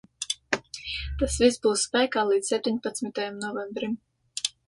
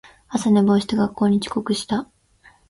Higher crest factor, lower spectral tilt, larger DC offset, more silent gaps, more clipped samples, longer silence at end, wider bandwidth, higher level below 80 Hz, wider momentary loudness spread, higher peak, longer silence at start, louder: about the same, 20 dB vs 16 dB; second, -3 dB/octave vs -6 dB/octave; neither; neither; neither; second, 0.2 s vs 0.65 s; about the same, 11.5 kHz vs 11.5 kHz; first, -44 dBFS vs -54 dBFS; about the same, 10 LU vs 10 LU; about the same, -8 dBFS vs -6 dBFS; about the same, 0.2 s vs 0.3 s; second, -27 LUFS vs -20 LUFS